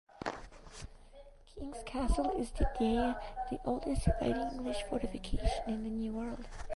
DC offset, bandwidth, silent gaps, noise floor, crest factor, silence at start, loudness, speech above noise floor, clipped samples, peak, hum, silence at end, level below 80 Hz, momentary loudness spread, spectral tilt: under 0.1%; 11.5 kHz; none; -55 dBFS; 20 dB; 0.15 s; -36 LUFS; 21 dB; under 0.1%; -16 dBFS; none; 0 s; -42 dBFS; 17 LU; -6 dB/octave